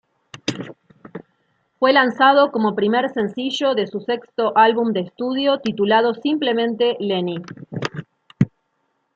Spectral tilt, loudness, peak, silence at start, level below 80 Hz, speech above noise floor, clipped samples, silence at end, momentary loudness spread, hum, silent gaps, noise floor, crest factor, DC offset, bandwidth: -5.5 dB/octave; -19 LUFS; -2 dBFS; 0.45 s; -62 dBFS; 51 dB; under 0.1%; 0.7 s; 17 LU; none; none; -70 dBFS; 18 dB; under 0.1%; 7.8 kHz